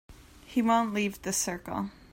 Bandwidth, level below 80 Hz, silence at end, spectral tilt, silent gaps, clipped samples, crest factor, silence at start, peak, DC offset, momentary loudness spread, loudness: 16.5 kHz; -56 dBFS; 0.2 s; -3.5 dB/octave; none; under 0.1%; 20 dB; 0.1 s; -12 dBFS; under 0.1%; 10 LU; -29 LUFS